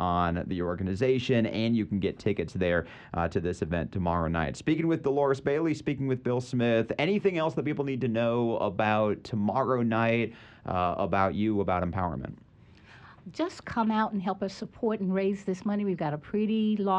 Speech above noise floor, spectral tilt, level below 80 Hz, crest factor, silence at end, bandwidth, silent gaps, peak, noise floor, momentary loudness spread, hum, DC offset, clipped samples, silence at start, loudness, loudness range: 26 dB; -7.5 dB/octave; -52 dBFS; 16 dB; 0 s; 9.2 kHz; none; -12 dBFS; -54 dBFS; 6 LU; none; under 0.1%; under 0.1%; 0 s; -29 LUFS; 4 LU